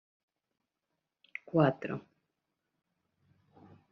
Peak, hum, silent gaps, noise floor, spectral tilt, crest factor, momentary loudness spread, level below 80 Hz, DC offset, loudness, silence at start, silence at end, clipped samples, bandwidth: -14 dBFS; none; none; -86 dBFS; -7 dB/octave; 24 dB; 18 LU; -78 dBFS; under 0.1%; -32 LUFS; 1.55 s; 1.9 s; under 0.1%; 6 kHz